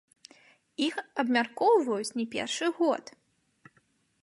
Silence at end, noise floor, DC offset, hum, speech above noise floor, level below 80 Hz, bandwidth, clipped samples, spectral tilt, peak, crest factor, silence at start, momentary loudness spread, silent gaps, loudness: 1.2 s; -69 dBFS; under 0.1%; none; 41 dB; -80 dBFS; 11.5 kHz; under 0.1%; -3 dB/octave; -12 dBFS; 20 dB; 0.8 s; 8 LU; none; -28 LUFS